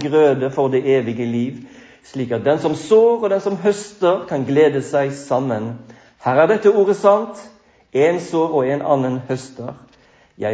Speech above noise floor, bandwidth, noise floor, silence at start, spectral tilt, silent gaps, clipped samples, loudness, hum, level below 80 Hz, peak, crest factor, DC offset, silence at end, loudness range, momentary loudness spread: 35 dB; 8 kHz; -52 dBFS; 0 s; -6.5 dB/octave; none; under 0.1%; -18 LUFS; none; -62 dBFS; -2 dBFS; 16 dB; under 0.1%; 0 s; 2 LU; 14 LU